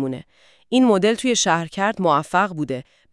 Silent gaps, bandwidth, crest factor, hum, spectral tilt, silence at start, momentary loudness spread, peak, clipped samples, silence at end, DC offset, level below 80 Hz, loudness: none; 12 kHz; 16 dB; none; -4 dB/octave; 0 s; 12 LU; -4 dBFS; under 0.1%; 0.3 s; under 0.1%; -60 dBFS; -19 LUFS